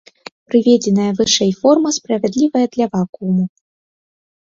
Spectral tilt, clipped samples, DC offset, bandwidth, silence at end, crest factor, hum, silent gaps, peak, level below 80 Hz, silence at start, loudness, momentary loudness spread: -5 dB/octave; under 0.1%; under 0.1%; 7.6 kHz; 0.95 s; 16 dB; none; 3.09-3.13 s; 0 dBFS; -56 dBFS; 0.5 s; -15 LUFS; 6 LU